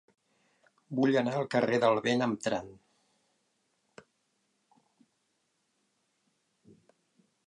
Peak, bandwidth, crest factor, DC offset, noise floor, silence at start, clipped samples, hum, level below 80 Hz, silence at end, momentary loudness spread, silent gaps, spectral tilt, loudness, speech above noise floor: -12 dBFS; 11 kHz; 22 dB; under 0.1%; -77 dBFS; 0.9 s; under 0.1%; none; -76 dBFS; 4.75 s; 11 LU; none; -5.5 dB/octave; -29 LUFS; 49 dB